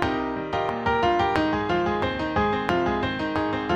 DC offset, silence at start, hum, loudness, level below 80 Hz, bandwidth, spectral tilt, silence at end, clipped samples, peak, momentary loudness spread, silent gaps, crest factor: under 0.1%; 0 s; none; -24 LUFS; -42 dBFS; 9.8 kHz; -6.5 dB/octave; 0 s; under 0.1%; -4 dBFS; 5 LU; none; 20 dB